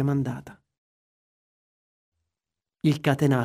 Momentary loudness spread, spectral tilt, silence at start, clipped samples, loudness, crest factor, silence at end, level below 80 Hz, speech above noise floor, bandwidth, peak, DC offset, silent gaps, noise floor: 10 LU; -7.5 dB/octave; 0 s; under 0.1%; -25 LUFS; 22 dB; 0 s; -62 dBFS; 66 dB; 15.5 kHz; -6 dBFS; under 0.1%; 0.78-2.12 s; -90 dBFS